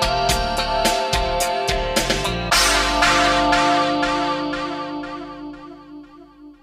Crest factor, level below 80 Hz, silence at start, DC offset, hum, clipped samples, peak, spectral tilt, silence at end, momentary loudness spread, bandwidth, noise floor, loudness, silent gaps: 16 dB; -32 dBFS; 0 s; under 0.1%; 50 Hz at -45 dBFS; under 0.1%; -4 dBFS; -2.5 dB/octave; 0.1 s; 17 LU; 16 kHz; -43 dBFS; -18 LUFS; none